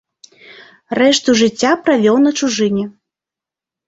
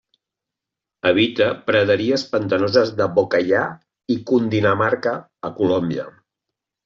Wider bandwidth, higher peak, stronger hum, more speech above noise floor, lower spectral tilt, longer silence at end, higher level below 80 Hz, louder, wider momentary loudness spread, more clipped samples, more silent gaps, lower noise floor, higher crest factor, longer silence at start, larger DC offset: about the same, 8 kHz vs 7.4 kHz; about the same, -2 dBFS vs -4 dBFS; neither; first, 74 dB vs 67 dB; about the same, -4 dB/octave vs -4 dB/octave; first, 1 s vs 0.75 s; about the same, -56 dBFS vs -60 dBFS; first, -14 LUFS vs -19 LUFS; about the same, 9 LU vs 10 LU; neither; neither; about the same, -87 dBFS vs -85 dBFS; about the same, 14 dB vs 16 dB; second, 0.9 s vs 1.05 s; neither